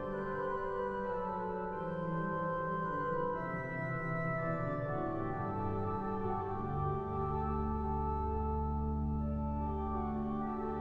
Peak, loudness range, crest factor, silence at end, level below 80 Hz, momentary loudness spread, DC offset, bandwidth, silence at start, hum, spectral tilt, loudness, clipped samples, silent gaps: -24 dBFS; 1 LU; 12 dB; 0 s; -46 dBFS; 2 LU; under 0.1%; 4.7 kHz; 0 s; none; -10 dB/octave; -37 LUFS; under 0.1%; none